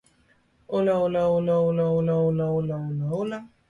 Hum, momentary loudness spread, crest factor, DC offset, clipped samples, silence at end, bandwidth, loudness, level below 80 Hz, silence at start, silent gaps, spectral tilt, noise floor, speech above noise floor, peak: none; 7 LU; 12 dB; under 0.1%; under 0.1%; 0.2 s; 10.5 kHz; -24 LUFS; -58 dBFS; 0.7 s; none; -9.5 dB/octave; -63 dBFS; 40 dB; -14 dBFS